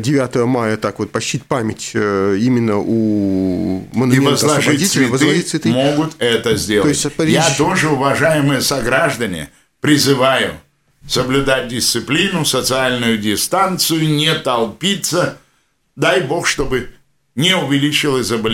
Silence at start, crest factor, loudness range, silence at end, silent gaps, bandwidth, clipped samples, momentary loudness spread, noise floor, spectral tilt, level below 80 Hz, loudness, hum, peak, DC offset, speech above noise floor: 0 s; 16 dB; 3 LU; 0 s; none; 17 kHz; under 0.1%; 7 LU; -61 dBFS; -4 dB/octave; -42 dBFS; -15 LUFS; none; 0 dBFS; under 0.1%; 46 dB